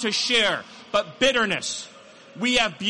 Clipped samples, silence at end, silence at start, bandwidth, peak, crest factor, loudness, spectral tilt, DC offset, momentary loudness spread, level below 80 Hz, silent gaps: under 0.1%; 0 s; 0 s; 11.5 kHz; -8 dBFS; 16 dB; -22 LUFS; -2 dB/octave; under 0.1%; 11 LU; -54 dBFS; none